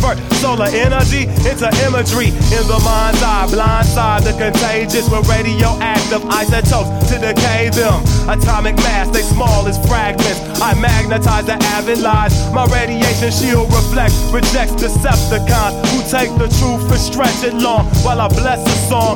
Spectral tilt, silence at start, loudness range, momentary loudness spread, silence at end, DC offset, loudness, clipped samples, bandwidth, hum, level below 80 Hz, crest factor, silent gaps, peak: -5 dB/octave; 0 s; 1 LU; 2 LU; 0 s; under 0.1%; -13 LUFS; under 0.1%; 19.5 kHz; none; -18 dBFS; 12 dB; none; 0 dBFS